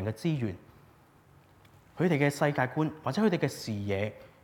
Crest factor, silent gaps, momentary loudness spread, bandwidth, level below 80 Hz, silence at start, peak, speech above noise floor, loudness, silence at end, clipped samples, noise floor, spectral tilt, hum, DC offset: 20 dB; none; 9 LU; 18.5 kHz; -68 dBFS; 0 s; -12 dBFS; 30 dB; -30 LUFS; 0.15 s; under 0.1%; -59 dBFS; -6.5 dB/octave; none; under 0.1%